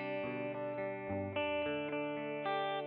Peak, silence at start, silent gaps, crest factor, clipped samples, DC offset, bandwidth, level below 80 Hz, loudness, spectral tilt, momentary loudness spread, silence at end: -24 dBFS; 0 s; none; 14 dB; under 0.1%; under 0.1%; 4.9 kHz; -74 dBFS; -38 LUFS; -3.5 dB/octave; 4 LU; 0 s